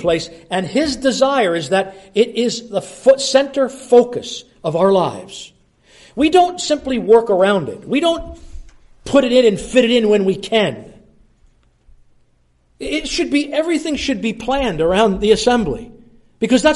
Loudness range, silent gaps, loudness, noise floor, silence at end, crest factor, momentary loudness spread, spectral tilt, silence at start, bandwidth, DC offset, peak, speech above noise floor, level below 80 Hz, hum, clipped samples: 6 LU; none; -16 LUFS; -57 dBFS; 0 s; 16 dB; 11 LU; -4.5 dB/octave; 0 s; 11.5 kHz; under 0.1%; 0 dBFS; 42 dB; -42 dBFS; none; under 0.1%